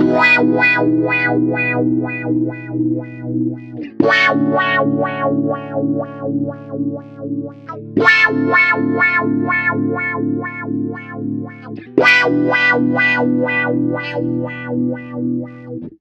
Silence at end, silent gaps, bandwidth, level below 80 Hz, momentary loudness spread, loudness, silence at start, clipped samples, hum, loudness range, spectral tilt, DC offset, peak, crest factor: 0.05 s; none; 7.8 kHz; -58 dBFS; 14 LU; -16 LUFS; 0 s; under 0.1%; none; 4 LU; -6.5 dB/octave; under 0.1%; 0 dBFS; 16 dB